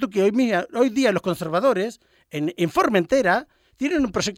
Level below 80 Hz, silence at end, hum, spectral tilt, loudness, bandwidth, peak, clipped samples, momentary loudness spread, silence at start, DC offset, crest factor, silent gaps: -54 dBFS; 0 s; none; -5 dB/octave; -21 LUFS; 16.5 kHz; -4 dBFS; under 0.1%; 9 LU; 0 s; under 0.1%; 18 dB; none